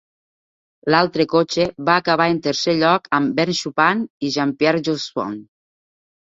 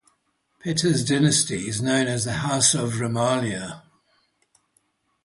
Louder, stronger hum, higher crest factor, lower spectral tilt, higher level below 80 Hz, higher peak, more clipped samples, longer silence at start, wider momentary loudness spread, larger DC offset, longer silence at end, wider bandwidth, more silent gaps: first, -18 LUFS vs -22 LUFS; neither; about the same, 18 dB vs 18 dB; about the same, -5 dB/octave vs -4 dB/octave; about the same, -58 dBFS vs -56 dBFS; first, -2 dBFS vs -6 dBFS; neither; first, 0.85 s vs 0.65 s; second, 7 LU vs 12 LU; neither; second, 0.8 s vs 1.45 s; second, 7.8 kHz vs 11.5 kHz; first, 4.10-4.20 s vs none